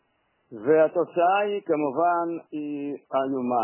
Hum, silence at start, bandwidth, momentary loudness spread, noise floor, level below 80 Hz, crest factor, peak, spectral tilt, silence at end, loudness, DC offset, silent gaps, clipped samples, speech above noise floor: none; 0.5 s; 3.2 kHz; 11 LU; -70 dBFS; -78 dBFS; 16 dB; -8 dBFS; -9.5 dB/octave; 0 s; -25 LUFS; under 0.1%; none; under 0.1%; 46 dB